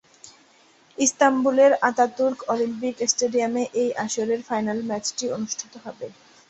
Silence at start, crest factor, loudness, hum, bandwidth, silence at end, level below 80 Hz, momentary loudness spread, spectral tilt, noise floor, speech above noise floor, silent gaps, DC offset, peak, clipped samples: 0.25 s; 20 dB; -22 LUFS; none; 8.4 kHz; 0.4 s; -68 dBFS; 17 LU; -2.5 dB/octave; -56 dBFS; 34 dB; none; under 0.1%; -4 dBFS; under 0.1%